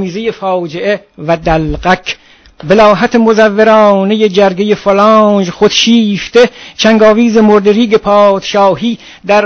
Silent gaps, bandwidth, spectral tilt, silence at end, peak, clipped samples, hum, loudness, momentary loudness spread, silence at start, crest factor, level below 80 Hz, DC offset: none; 8 kHz; -5 dB/octave; 0 s; 0 dBFS; 2%; none; -8 LUFS; 9 LU; 0 s; 8 dB; -34 dBFS; under 0.1%